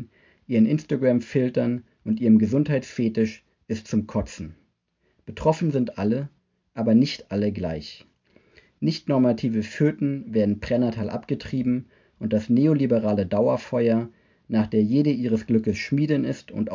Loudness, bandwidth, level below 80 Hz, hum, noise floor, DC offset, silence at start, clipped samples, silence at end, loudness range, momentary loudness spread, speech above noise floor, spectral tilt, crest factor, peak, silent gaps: -23 LUFS; 7.4 kHz; -50 dBFS; none; -70 dBFS; under 0.1%; 0 s; under 0.1%; 0 s; 5 LU; 10 LU; 48 dB; -8 dB/octave; 18 dB; -6 dBFS; none